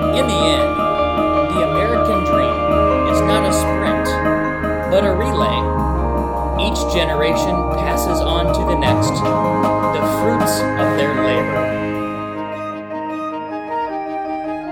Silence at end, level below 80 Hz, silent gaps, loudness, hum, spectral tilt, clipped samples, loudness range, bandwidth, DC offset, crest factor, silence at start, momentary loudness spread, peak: 0 s; -28 dBFS; none; -17 LUFS; none; -5.5 dB/octave; under 0.1%; 4 LU; 17.5 kHz; under 0.1%; 16 dB; 0 s; 9 LU; -2 dBFS